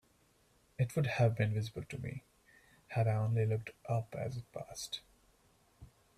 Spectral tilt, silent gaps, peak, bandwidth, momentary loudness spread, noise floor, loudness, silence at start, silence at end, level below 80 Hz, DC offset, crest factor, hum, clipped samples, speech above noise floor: -6.5 dB/octave; none; -18 dBFS; 13.5 kHz; 14 LU; -70 dBFS; -37 LUFS; 0.8 s; 0.3 s; -64 dBFS; under 0.1%; 20 dB; none; under 0.1%; 35 dB